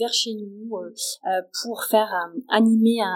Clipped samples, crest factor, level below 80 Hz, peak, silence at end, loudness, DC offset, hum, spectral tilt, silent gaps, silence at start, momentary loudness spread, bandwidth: under 0.1%; 18 dB; under -90 dBFS; -4 dBFS; 0 s; -22 LUFS; under 0.1%; none; -3.5 dB/octave; none; 0 s; 15 LU; 17.5 kHz